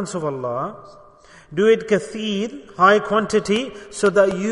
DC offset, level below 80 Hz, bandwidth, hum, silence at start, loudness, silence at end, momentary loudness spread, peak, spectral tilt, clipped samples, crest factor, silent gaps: under 0.1%; -54 dBFS; 11 kHz; none; 0 s; -19 LUFS; 0 s; 13 LU; -2 dBFS; -5 dB/octave; under 0.1%; 18 dB; none